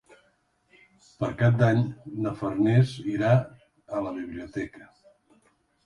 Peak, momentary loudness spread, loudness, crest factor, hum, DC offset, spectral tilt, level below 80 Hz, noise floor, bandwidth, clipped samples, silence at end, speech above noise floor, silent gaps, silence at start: -8 dBFS; 14 LU; -26 LUFS; 18 dB; none; under 0.1%; -8.5 dB/octave; -58 dBFS; -68 dBFS; 9.8 kHz; under 0.1%; 1 s; 43 dB; none; 1.2 s